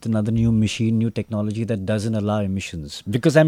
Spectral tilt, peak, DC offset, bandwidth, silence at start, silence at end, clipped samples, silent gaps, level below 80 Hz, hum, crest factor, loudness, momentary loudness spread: -7 dB/octave; -2 dBFS; under 0.1%; 13.5 kHz; 0 s; 0 s; under 0.1%; none; -44 dBFS; none; 18 dB; -22 LUFS; 7 LU